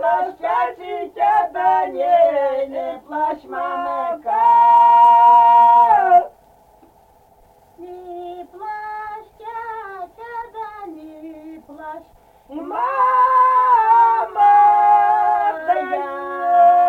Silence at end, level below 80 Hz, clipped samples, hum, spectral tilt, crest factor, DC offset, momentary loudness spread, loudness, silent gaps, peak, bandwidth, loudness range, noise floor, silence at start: 0 s; -60 dBFS; under 0.1%; none; -4.5 dB/octave; 14 dB; under 0.1%; 23 LU; -15 LUFS; none; -4 dBFS; 4.5 kHz; 20 LU; -52 dBFS; 0 s